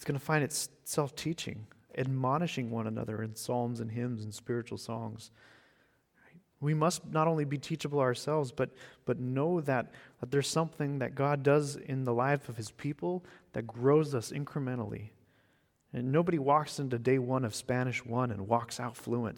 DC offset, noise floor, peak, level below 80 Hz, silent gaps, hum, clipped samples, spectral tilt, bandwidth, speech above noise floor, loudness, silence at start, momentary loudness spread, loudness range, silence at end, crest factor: under 0.1%; -71 dBFS; -12 dBFS; -68 dBFS; none; none; under 0.1%; -6 dB/octave; 18.5 kHz; 39 dB; -33 LUFS; 0 s; 12 LU; 5 LU; 0 s; 20 dB